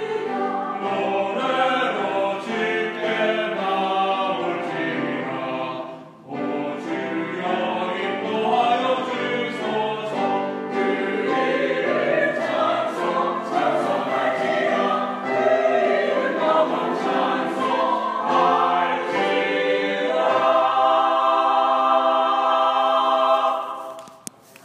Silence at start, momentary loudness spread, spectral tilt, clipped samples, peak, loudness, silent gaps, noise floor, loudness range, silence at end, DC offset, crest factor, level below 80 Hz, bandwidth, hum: 0 s; 8 LU; -5 dB/octave; under 0.1%; -6 dBFS; -21 LUFS; none; -42 dBFS; 6 LU; 0.5 s; under 0.1%; 16 dB; -80 dBFS; 12.5 kHz; none